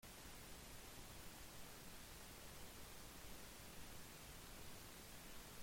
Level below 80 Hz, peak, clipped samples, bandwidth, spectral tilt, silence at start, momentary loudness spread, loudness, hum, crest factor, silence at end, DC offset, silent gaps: -64 dBFS; -42 dBFS; under 0.1%; 16.5 kHz; -2.5 dB/octave; 0 s; 0 LU; -57 LUFS; none; 14 dB; 0 s; under 0.1%; none